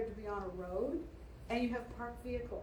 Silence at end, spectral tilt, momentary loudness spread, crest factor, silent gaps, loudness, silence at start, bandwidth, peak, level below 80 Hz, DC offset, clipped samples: 0 s; -7 dB/octave; 9 LU; 16 dB; none; -41 LUFS; 0 s; over 20 kHz; -26 dBFS; -52 dBFS; under 0.1%; under 0.1%